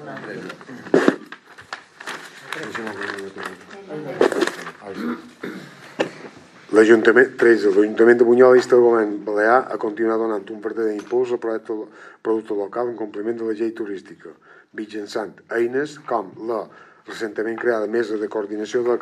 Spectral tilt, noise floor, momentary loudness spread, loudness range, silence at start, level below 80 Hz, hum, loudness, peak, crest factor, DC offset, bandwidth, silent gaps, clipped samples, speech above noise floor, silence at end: -5.5 dB/octave; -42 dBFS; 21 LU; 12 LU; 0 s; -78 dBFS; none; -20 LUFS; 0 dBFS; 20 dB; under 0.1%; 11.5 kHz; none; under 0.1%; 23 dB; 0 s